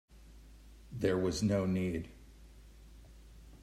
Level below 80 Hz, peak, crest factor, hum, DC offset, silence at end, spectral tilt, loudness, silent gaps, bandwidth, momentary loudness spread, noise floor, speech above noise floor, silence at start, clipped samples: -56 dBFS; -18 dBFS; 20 dB; none; under 0.1%; 0.05 s; -6.5 dB/octave; -34 LUFS; none; 14 kHz; 19 LU; -56 dBFS; 23 dB; 0.15 s; under 0.1%